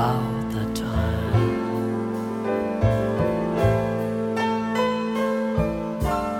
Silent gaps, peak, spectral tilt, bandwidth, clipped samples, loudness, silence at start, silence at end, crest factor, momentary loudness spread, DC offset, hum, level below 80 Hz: none; -8 dBFS; -7.5 dB/octave; 16.5 kHz; under 0.1%; -24 LUFS; 0 s; 0 s; 16 dB; 5 LU; under 0.1%; none; -38 dBFS